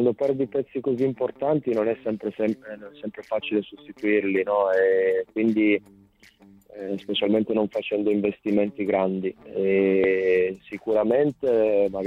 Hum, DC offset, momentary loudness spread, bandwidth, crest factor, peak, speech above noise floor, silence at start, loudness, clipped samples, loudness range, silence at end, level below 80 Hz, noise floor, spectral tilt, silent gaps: none; under 0.1%; 10 LU; 6.4 kHz; 16 dB; -8 dBFS; 31 dB; 0 s; -24 LUFS; under 0.1%; 4 LU; 0 s; -62 dBFS; -54 dBFS; -8 dB/octave; none